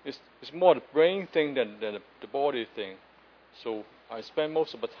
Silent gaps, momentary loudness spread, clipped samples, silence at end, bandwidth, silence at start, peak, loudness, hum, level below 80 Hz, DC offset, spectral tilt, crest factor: none; 18 LU; under 0.1%; 0 s; 5.4 kHz; 0.05 s; -6 dBFS; -29 LUFS; none; -76 dBFS; under 0.1%; -6.5 dB/octave; 24 dB